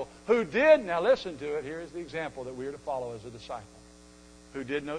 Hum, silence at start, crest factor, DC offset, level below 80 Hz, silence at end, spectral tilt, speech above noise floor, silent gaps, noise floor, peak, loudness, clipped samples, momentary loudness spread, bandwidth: none; 0 s; 20 dB; under 0.1%; -60 dBFS; 0 s; -5 dB/octave; 24 dB; none; -53 dBFS; -10 dBFS; -29 LUFS; under 0.1%; 19 LU; 10 kHz